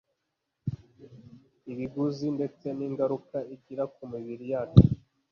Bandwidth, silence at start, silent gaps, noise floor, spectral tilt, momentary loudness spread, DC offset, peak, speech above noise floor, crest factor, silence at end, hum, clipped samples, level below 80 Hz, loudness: 6.6 kHz; 0.65 s; none; -82 dBFS; -10 dB/octave; 19 LU; under 0.1%; -2 dBFS; 55 dB; 26 dB; 0.35 s; none; under 0.1%; -44 dBFS; -29 LUFS